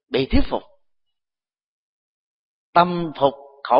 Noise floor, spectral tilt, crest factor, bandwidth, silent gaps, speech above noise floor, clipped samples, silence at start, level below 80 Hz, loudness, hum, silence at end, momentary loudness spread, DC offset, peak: under -90 dBFS; -11 dB/octave; 22 dB; 5.4 kHz; 1.63-2.73 s; over 71 dB; under 0.1%; 0.1 s; -34 dBFS; -21 LUFS; none; 0 s; 11 LU; under 0.1%; 0 dBFS